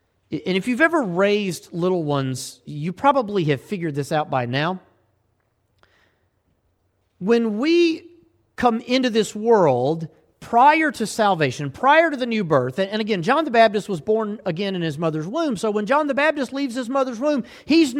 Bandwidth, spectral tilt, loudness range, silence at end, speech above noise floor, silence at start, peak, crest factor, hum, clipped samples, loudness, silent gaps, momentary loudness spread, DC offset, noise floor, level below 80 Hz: 15 kHz; -5.5 dB/octave; 7 LU; 0 s; 47 dB; 0.3 s; -4 dBFS; 18 dB; none; under 0.1%; -20 LUFS; none; 10 LU; under 0.1%; -67 dBFS; -62 dBFS